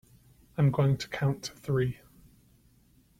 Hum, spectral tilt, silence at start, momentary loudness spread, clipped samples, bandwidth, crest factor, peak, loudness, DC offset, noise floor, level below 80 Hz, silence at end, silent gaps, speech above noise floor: none; -7 dB/octave; 0.6 s; 13 LU; under 0.1%; 14.5 kHz; 18 dB; -14 dBFS; -29 LUFS; under 0.1%; -63 dBFS; -58 dBFS; 1.25 s; none; 35 dB